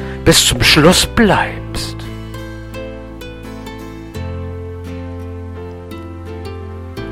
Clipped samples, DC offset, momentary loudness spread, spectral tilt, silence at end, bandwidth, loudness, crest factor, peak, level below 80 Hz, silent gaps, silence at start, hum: under 0.1%; 0.2%; 21 LU; -3.5 dB/octave; 0 s; 16.5 kHz; -12 LUFS; 18 dB; 0 dBFS; -30 dBFS; none; 0 s; none